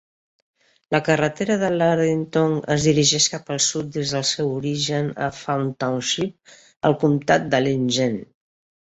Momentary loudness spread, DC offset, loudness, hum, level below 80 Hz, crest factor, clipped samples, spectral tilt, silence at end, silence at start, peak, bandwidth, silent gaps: 7 LU; under 0.1%; -21 LUFS; none; -56 dBFS; 18 dB; under 0.1%; -4 dB/octave; 0.55 s; 0.9 s; -2 dBFS; 8.2 kHz; 6.76-6.80 s